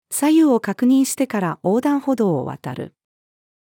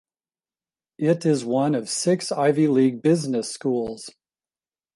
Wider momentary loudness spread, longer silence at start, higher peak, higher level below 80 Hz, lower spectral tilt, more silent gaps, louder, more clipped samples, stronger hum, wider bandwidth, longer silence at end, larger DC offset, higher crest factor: first, 15 LU vs 8 LU; second, 0.1 s vs 1 s; about the same, -6 dBFS vs -6 dBFS; about the same, -70 dBFS vs -66 dBFS; about the same, -5.5 dB/octave vs -5.5 dB/octave; neither; first, -18 LUFS vs -22 LUFS; neither; neither; first, 18.5 kHz vs 11.5 kHz; about the same, 0.85 s vs 0.85 s; neither; about the same, 14 dB vs 16 dB